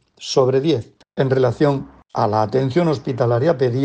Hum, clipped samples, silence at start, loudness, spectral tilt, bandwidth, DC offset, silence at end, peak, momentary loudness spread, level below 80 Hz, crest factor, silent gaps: none; under 0.1%; 0.2 s; -19 LUFS; -7 dB/octave; 9 kHz; under 0.1%; 0 s; -4 dBFS; 7 LU; -54 dBFS; 14 dB; none